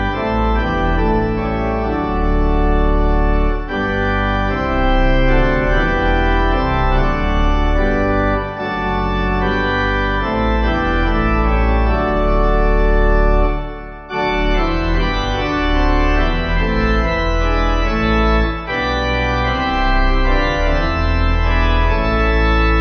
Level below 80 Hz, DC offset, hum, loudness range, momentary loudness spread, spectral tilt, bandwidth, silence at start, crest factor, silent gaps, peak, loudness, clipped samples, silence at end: -18 dBFS; under 0.1%; none; 1 LU; 3 LU; -7 dB/octave; 6.2 kHz; 0 s; 12 dB; none; -2 dBFS; -17 LUFS; under 0.1%; 0 s